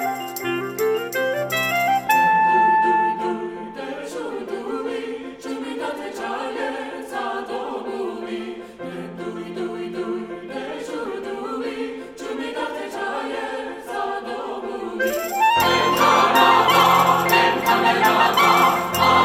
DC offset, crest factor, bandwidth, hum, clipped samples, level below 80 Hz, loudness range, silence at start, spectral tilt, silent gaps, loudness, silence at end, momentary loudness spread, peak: under 0.1%; 18 dB; over 20 kHz; none; under 0.1%; -58 dBFS; 14 LU; 0 s; -3.5 dB/octave; none; -20 LUFS; 0 s; 16 LU; -2 dBFS